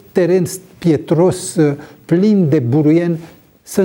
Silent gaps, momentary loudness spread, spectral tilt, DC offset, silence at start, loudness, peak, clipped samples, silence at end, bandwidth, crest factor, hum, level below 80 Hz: none; 9 LU; -7 dB/octave; under 0.1%; 0.15 s; -15 LUFS; -2 dBFS; under 0.1%; 0 s; 18.5 kHz; 12 dB; none; -54 dBFS